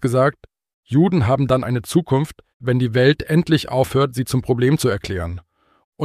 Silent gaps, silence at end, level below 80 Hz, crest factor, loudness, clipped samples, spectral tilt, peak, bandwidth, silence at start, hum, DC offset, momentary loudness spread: 0.74-0.83 s, 2.54-2.60 s, 5.84-5.92 s; 0 s; -44 dBFS; 16 dB; -19 LUFS; under 0.1%; -6.5 dB/octave; -2 dBFS; 15 kHz; 0 s; none; under 0.1%; 10 LU